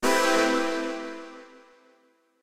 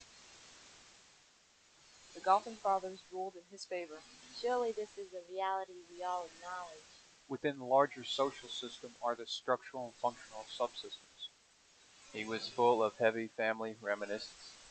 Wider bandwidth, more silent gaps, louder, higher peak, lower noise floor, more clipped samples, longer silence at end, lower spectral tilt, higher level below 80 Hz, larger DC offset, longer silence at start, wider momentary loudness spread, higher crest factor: first, 16 kHz vs 9 kHz; neither; first, -25 LUFS vs -38 LUFS; first, -10 dBFS vs -16 dBFS; about the same, -64 dBFS vs -67 dBFS; neither; about the same, 0 s vs 0 s; second, -2 dB/octave vs -3.5 dB/octave; first, -60 dBFS vs -80 dBFS; neither; about the same, 0 s vs 0 s; about the same, 22 LU vs 20 LU; second, 18 dB vs 24 dB